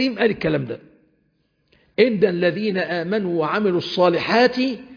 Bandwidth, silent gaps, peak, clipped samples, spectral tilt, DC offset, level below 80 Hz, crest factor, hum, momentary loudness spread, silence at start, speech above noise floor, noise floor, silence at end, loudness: 5.2 kHz; none; -4 dBFS; under 0.1%; -7 dB/octave; under 0.1%; -58 dBFS; 16 dB; none; 7 LU; 0 s; 47 dB; -66 dBFS; 0 s; -20 LUFS